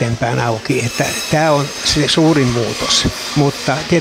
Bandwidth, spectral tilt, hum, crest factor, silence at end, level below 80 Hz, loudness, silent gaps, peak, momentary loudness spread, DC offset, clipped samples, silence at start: 16 kHz; -4 dB/octave; none; 14 dB; 0 s; -36 dBFS; -15 LUFS; none; -2 dBFS; 6 LU; under 0.1%; under 0.1%; 0 s